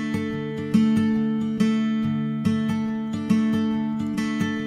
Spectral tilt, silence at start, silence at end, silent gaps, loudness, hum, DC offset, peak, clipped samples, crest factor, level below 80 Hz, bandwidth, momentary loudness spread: -7 dB/octave; 0 s; 0 s; none; -23 LUFS; none; under 0.1%; -8 dBFS; under 0.1%; 14 dB; -56 dBFS; 11 kHz; 7 LU